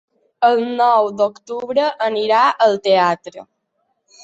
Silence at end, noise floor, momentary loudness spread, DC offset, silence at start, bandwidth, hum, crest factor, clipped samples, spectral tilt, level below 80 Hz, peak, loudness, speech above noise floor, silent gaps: 0.8 s; -69 dBFS; 7 LU; under 0.1%; 0.4 s; 8 kHz; none; 16 dB; under 0.1%; -4.5 dB/octave; -68 dBFS; -2 dBFS; -16 LUFS; 53 dB; none